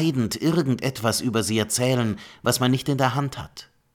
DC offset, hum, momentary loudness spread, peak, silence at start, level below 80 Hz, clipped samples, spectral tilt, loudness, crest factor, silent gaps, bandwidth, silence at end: under 0.1%; none; 8 LU; -6 dBFS; 0 s; -54 dBFS; under 0.1%; -5 dB/octave; -23 LUFS; 18 dB; none; 18 kHz; 0.3 s